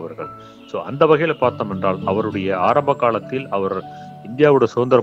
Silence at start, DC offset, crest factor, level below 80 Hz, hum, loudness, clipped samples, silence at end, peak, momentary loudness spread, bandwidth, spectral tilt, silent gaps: 0 s; under 0.1%; 18 dB; -60 dBFS; none; -18 LUFS; under 0.1%; 0 s; -2 dBFS; 17 LU; 7.8 kHz; -7.5 dB/octave; none